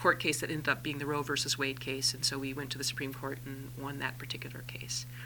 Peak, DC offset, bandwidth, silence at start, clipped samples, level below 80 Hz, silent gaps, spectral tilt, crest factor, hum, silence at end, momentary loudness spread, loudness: -12 dBFS; under 0.1%; 19 kHz; 0 s; under 0.1%; -60 dBFS; none; -3 dB/octave; 24 dB; none; 0 s; 11 LU; -34 LUFS